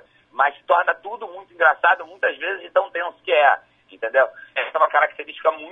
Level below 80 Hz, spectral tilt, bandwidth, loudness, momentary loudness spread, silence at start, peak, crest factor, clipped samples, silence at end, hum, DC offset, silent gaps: -76 dBFS; -3 dB/octave; 3.9 kHz; -20 LUFS; 12 LU; 0.35 s; -2 dBFS; 20 dB; under 0.1%; 0 s; none; under 0.1%; none